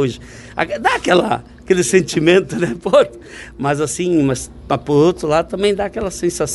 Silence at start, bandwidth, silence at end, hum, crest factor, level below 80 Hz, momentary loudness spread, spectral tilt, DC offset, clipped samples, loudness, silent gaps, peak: 0 s; 12 kHz; 0 s; none; 16 dB; -42 dBFS; 9 LU; -5 dB/octave; under 0.1%; under 0.1%; -16 LUFS; none; 0 dBFS